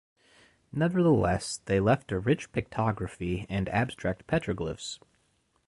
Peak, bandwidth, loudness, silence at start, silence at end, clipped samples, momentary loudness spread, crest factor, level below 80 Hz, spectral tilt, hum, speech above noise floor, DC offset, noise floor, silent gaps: -10 dBFS; 11.5 kHz; -29 LUFS; 0.75 s; 0.7 s; under 0.1%; 10 LU; 18 dB; -48 dBFS; -6.5 dB/octave; none; 43 dB; under 0.1%; -71 dBFS; none